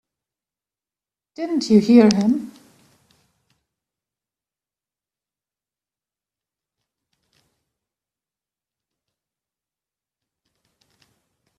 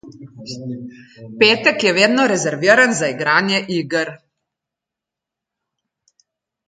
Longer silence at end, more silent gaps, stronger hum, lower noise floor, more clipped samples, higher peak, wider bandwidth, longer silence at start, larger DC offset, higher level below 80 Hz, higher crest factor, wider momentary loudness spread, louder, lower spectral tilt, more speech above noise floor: first, 9.1 s vs 2.5 s; neither; neither; first, under -90 dBFS vs -85 dBFS; neither; about the same, -2 dBFS vs 0 dBFS; about the same, 9.8 kHz vs 9.4 kHz; first, 1.4 s vs 0.05 s; neither; about the same, -66 dBFS vs -66 dBFS; about the same, 24 dB vs 20 dB; second, 17 LU vs 20 LU; about the same, -16 LUFS vs -15 LUFS; first, -6.5 dB/octave vs -3.5 dB/octave; first, over 75 dB vs 68 dB